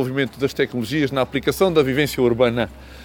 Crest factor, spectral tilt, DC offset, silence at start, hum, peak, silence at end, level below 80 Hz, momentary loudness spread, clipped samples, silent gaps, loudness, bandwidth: 16 dB; -5.5 dB/octave; under 0.1%; 0 s; none; -4 dBFS; 0 s; -44 dBFS; 5 LU; under 0.1%; none; -20 LUFS; 19 kHz